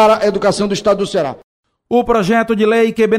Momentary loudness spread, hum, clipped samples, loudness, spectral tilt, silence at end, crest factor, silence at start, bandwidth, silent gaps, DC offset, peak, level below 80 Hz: 5 LU; none; under 0.1%; -14 LUFS; -5 dB/octave; 0 s; 12 dB; 0 s; 14.5 kHz; 1.43-1.63 s; under 0.1%; -2 dBFS; -44 dBFS